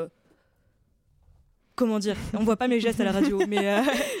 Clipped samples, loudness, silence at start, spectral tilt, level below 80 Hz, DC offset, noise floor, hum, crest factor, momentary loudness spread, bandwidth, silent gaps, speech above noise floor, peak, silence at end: under 0.1%; -25 LUFS; 0 s; -5 dB/octave; -52 dBFS; under 0.1%; -66 dBFS; none; 14 dB; 6 LU; 17 kHz; none; 42 dB; -12 dBFS; 0 s